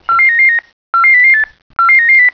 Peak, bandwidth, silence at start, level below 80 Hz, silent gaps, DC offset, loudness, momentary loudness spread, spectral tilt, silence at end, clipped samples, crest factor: -2 dBFS; 5.4 kHz; 0.1 s; -54 dBFS; 0.73-0.93 s, 1.62-1.70 s; under 0.1%; -7 LUFS; 11 LU; -1.5 dB/octave; 0 s; under 0.1%; 6 dB